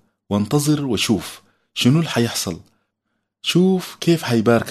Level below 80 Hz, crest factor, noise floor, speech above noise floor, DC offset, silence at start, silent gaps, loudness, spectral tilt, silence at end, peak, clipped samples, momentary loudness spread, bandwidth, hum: -56 dBFS; 18 dB; -75 dBFS; 57 dB; under 0.1%; 0.3 s; none; -19 LUFS; -5 dB/octave; 0 s; -2 dBFS; under 0.1%; 10 LU; 13.5 kHz; none